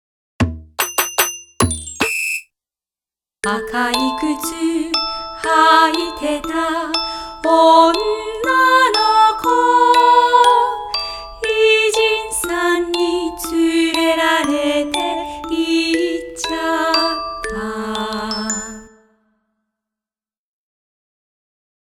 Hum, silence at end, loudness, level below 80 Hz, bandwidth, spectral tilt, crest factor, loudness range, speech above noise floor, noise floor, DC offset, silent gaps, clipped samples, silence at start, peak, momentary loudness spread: none; 3.1 s; -16 LUFS; -44 dBFS; 18 kHz; -3 dB/octave; 18 dB; 8 LU; over 75 dB; under -90 dBFS; under 0.1%; none; under 0.1%; 0.4 s; 0 dBFS; 12 LU